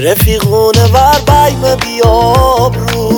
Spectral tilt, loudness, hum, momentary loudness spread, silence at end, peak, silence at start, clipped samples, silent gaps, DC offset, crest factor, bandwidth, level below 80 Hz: -5 dB/octave; -8 LUFS; none; 5 LU; 0 s; 0 dBFS; 0 s; 0.1%; none; under 0.1%; 8 dB; over 20 kHz; -20 dBFS